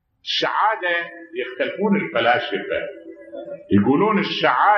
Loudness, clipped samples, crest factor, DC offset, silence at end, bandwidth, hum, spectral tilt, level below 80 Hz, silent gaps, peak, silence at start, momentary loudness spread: -20 LUFS; under 0.1%; 18 dB; under 0.1%; 0 s; 6.8 kHz; none; -6 dB/octave; -60 dBFS; none; -4 dBFS; 0.25 s; 17 LU